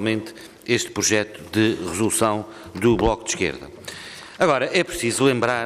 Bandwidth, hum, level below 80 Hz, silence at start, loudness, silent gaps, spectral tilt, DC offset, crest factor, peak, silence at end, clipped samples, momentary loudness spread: 15.5 kHz; none; -44 dBFS; 0 s; -21 LUFS; none; -4 dB/octave; under 0.1%; 16 dB; -6 dBFS; 0 s; under 0.1%; 16 LU